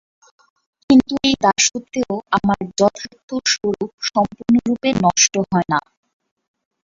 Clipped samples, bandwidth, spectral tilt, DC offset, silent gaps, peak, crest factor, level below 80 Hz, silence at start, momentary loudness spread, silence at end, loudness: under 0.1%; 7.8 kHz; -3.5 dB/octave; under 0.1%; 3.23-3.28 s, 3.93-3.98 s; -2 dBFS; 18 dB; -50 dBFS; 0.9 s; 9 LU; 1.05 s; -17 LUFS